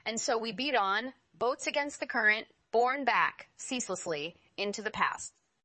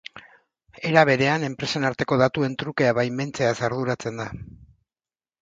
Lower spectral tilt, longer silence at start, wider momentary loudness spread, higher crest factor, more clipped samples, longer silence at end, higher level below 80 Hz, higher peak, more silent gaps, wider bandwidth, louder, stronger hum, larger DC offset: second, -2 dB/octave vs -5.5 dB/octave; about the same, 0.05 s vs 0.15 s; second, 10 LU vs 13 LU; about the same, 18 dB vs 22 dB; neither; second, 0.35 s vs 0.8 s; second, -74 dBFS vs -56 dBFS; second, -14 dBFS vs -2 dBFS; neither; about the same, 8.8 kHz vs 8.8 kHz; second, -31 LUFS vs -23 LUFS; neither; neither